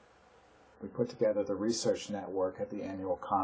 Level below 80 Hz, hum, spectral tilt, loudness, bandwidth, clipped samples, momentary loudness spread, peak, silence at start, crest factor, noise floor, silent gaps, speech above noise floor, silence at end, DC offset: -66 dBFS; none; -5 dB/octave; -34 LUFS; 8 kHz; under 0.1%; 8 LU; -18 dBFS; 0.8 s; 16 dB; -62 dBFS; none; 28 dB; 0 s; under 0.1%